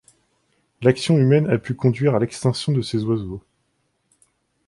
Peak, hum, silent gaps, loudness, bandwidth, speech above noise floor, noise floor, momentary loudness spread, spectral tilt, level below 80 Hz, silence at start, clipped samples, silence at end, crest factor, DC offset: -2 dBFS; none; none; -20 LUFS; 11.5 kHz; 51 dB; -69 dBFS; 8 LU; -7 dB/octave; -54 dBFS; 0.8 s; under 0.1%; 1.3 s; 18 dB; under 0.1%